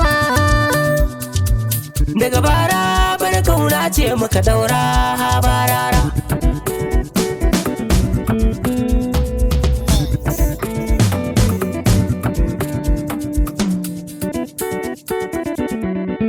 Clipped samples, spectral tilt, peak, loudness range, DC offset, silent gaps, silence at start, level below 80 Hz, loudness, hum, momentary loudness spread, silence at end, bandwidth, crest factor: under 0.1%; -5 dB/octave; -2 dBFS; 5 LU; under 0.1%; none; 0 s; -22 dBFS; -17 LUFS; none; 7 LU; 0 s; 20 kHz; 14 dB